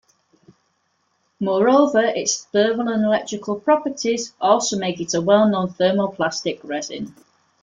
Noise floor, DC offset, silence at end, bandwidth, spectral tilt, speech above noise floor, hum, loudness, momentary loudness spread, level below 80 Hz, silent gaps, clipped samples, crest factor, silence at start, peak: -68 dBFS; under 0.1%; 0.5 s; 9.4 kHz; -4 dB/octave; 49 dB; none; -20 LUFS; 11 LU; -64 dBFS; none; under 0.1%; 18 dB; 1.4 s; -4 dBFS